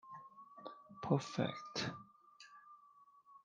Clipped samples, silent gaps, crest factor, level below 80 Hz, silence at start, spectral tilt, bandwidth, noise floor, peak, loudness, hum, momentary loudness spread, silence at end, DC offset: under 0.1%; none; 26 dB; -80 dBFS; 0.05 s; -5.5 dB/octave; 9.6 kHz; -66 dBFS; -18 dBFS; -41 LUFS; 50 Hz at -65 dBFS; 24 LU; 0.05 s; under 0.1%